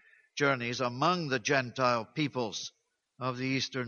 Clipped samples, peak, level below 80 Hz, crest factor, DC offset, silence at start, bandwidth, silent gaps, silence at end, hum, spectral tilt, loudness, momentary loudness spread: under 0.1%; -12 dBFS; -72 dBFS; 20 dB; under 0.1%; 0.35 s; 7.2 kHz; none; 0 s; none; -4.5 dB/octave; -31 LUFS; 9 LU